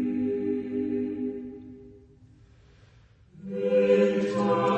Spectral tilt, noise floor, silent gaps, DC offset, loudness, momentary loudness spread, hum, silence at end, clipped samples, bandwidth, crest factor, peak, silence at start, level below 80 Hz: -7.5 dB/octave; -57 dBFS; none; under 0.1%; -26 LUFS; 20 LU; none; 0 s; under 0.1%; 8.4 kHz; 18 dB; -10 dBFS; 0 s; -62 dBFS